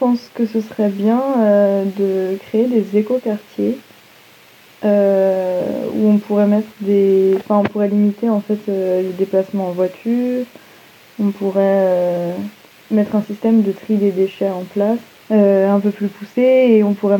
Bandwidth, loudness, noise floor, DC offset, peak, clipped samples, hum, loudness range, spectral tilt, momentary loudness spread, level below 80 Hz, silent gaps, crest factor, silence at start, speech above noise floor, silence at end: 18.5 kHz; -16 LUFS; -46 dBFS; under 0.1%; 0 dBFS; under 0.1%; none; 4 LU; -8.5 dB/octave; 8 LU; -68 dBFS; none; 16 dB; 0 s; 30 dB; 0 s